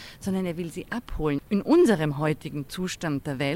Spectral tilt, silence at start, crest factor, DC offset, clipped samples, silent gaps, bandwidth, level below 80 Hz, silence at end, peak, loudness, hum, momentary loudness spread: -6.5 dB/octave; 0 s; 18 dB; under 0.1%; under 0.1%; none; 16 kHz; -44 dBFS; 0 s; -8 dBFS; -26 LUFS; none; 14 LU